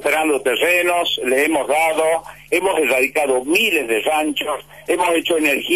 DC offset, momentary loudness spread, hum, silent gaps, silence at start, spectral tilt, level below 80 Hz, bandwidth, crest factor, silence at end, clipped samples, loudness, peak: 0.2%; 6 LU; none; none; 0 s; -2 dB/octave; -56 dBFS; 13.5 kHz; 12 dB; 0 s; under 0.1%; -17 LUFS; -6 dBFS